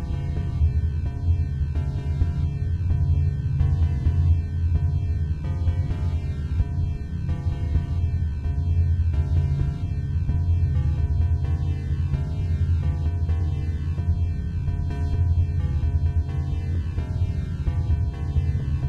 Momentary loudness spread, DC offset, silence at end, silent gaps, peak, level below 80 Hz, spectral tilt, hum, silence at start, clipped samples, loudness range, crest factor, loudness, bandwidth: 5 LU; under 0.1%; 0 s; none; -10 dBFS; -28 dBFS; -9 dB/octave; none; 0 s; under 0.1%; 2 LU; 14 dB; -25 LUFS; 4.6 kHz